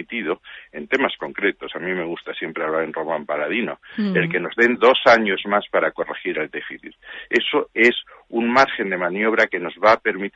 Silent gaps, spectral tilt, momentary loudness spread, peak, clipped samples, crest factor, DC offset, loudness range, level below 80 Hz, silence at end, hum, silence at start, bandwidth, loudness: none; -5.5 dB/octave; 13 LU; -2 dBFS; under 0.1%; 18 dB; under 0.1%; 5 LU; -62 dBFS; 0.05 s; none; 0 s; 8 kHz; -20 LUFS